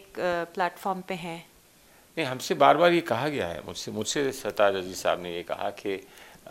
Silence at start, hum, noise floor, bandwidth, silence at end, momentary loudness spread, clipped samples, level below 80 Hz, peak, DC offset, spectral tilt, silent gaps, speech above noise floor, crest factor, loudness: 0 s; none; -57 dBFS; 16 kHz; 0 s; 14 LU; under 0.1%; -64 dBFS; -4 dBFS; under 0.1%; -4 dB/octave; none; 30 dB; 24 dB; -27 LUFS